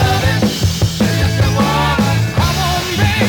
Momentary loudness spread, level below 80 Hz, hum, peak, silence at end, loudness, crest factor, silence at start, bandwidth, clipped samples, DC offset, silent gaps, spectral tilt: 2 LU; -28 dBFS; none; -2 dBFS; 0 s; -14 LUFS; 12 dB; 0 s; over 20 kHz; under 0.1%; under 0.1%; none; -5 dB/octave